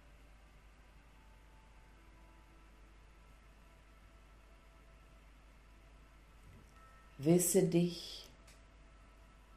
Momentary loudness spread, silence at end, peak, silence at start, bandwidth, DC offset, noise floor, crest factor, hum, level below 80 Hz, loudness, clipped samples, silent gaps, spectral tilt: 31 LU; 1.3 s; -18 dBFS; 7.2 s; 14 kHz; under 0.1%; -61 dBFS; 24 dB; none; -62 dBFS; -33 LUFS; under 0.1%; none; -5.5 dB/octave